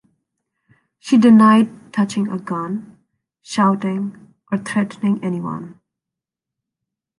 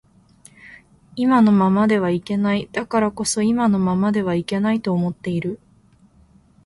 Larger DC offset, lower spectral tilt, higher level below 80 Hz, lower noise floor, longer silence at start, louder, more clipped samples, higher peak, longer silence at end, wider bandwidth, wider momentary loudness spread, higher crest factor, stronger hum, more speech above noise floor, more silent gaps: neither; about the same, -6.5 dB/octave vs -6 dB/octave; second, -64 dBFS vs -54 dBFS; first, -86 dBFS vs -54 dBFS; first, 1.05 s vs 0.65 s; about the same, -17 LUFS vs -19 LUFS; neither; about the same, -2 dBFS vs -4 dBFS; first, 1.45 s vs 1.1 s; about the same, 11 kHz vs 11.5 kHz; first, 18 LU vs 10 LU; about the same, 16 dB vs 16 dB; neither; first, 69 dB vs 35 dB; neither